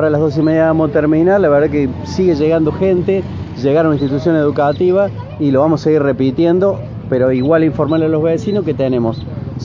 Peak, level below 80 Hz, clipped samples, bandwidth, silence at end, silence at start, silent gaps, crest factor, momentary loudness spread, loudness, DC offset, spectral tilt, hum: 0 dBFS; -38 dBFS; under 0.1%; 7.4 kHz; 0 s; 0 s; none; 14 dB; 7 LU; -14 LUFS; under 0.1%; -8.5 dB/octave; none